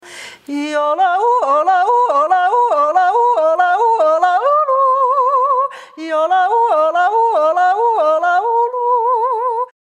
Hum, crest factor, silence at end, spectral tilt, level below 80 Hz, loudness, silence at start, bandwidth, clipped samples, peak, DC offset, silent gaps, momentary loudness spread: none; 12 dB; 0.3 s; -2 dB/octave; -80 dBFS; -14 LUFS; 0.05 s; 10.5 kHz; under 0.1%; -2 dBFS; under 0.1%; none; 6 LU